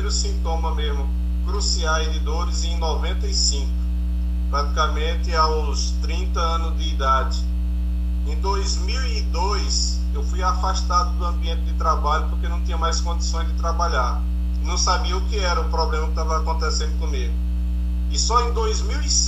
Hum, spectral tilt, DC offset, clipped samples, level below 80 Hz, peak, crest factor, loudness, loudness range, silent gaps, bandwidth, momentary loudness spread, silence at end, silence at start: 60 Hz at -20 dBFS; -4 dB/octave; under 0.1%; under 0.1%; -22 dBFS; -6 dBFS; 16 dB; -22 LUFS; 1 LU; none; 8.4 kHz; 5 LU; 0 s; 0 s